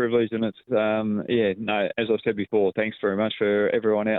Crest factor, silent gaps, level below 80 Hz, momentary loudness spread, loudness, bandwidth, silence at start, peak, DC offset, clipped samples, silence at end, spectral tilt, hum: 14 dB; none; -68 dBFS; 3 LU; -24 LUFS; 4.1 kHz; 0 s; -10 dBFS; under 0.1%; under 0.1%; 0 s; -9.5 dB/octave; none